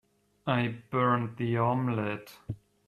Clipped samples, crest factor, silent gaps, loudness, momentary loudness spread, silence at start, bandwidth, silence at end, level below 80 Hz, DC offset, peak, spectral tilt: under 0.1%; 20 dB; none; -30 LUFS; 15 LU; 0.45 s; 14 kHz; 0.3 s; -64 dBFS; under 0.1%; -12 dBFS; -8 dB/octave